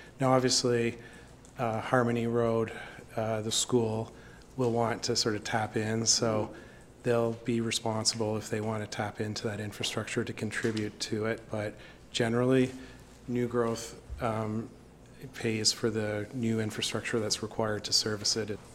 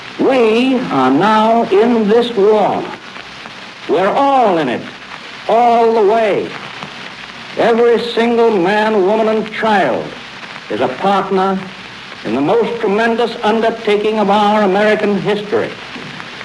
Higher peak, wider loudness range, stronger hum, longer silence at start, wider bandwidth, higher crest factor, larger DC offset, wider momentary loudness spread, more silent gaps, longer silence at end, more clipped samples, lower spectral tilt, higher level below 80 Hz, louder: second, -8 dBFS vs 0 dBFS; about the same, 4 LU vs 3 LU; neither; about the same, 0 s vs 0 s; first, 16.5 kHz vs 11 kHz; first, 22 dB vs 12 dB; neither; second, 12 LU vs 17 LU; neither; about the same, 0 s vs 0 s; neither; second, -4 dB/octave vs -6 dB/octave; about the same, -58 dBFS vs -56 dBFS; second, -30 LUFS vs -13 LUFS